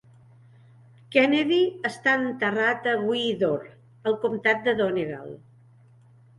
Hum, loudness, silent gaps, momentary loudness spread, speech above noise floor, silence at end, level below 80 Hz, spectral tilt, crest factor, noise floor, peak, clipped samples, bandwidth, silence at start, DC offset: none; -24 LUFS; none; 10 LU; 30 dB; 1.05 s; -66 dBFS; -5.5 dB/octave; 20 dB; -54 dBFS; -6 dBFS; under 0.1%; 11.5 kHz; 1.1 s; under 0.1%